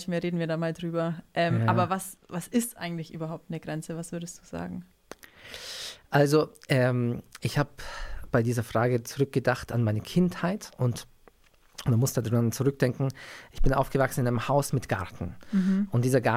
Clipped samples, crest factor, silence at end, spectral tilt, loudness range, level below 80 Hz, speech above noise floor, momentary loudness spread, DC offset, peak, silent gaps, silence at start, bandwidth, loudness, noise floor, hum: under 0.1%; 18 dB; 0 s; -6 dB/octave; 6 LU; -42 dBFS; 32 dB; 14 LU; under 0.1%; -10 dBFS; none; 0 s; 16 kHz; -28 LUFS; -59 dBFS; none